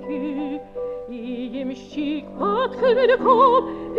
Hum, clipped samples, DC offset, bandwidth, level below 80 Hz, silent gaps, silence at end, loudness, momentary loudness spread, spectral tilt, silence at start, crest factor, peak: none; under 0.1%; under 0.1%; 6.8 kHz; -52 dBFS; none; 0 s; -21 LUFS; 15 LU; -6.5 dB/octave; 0 s; 16 dB; -4 dBFS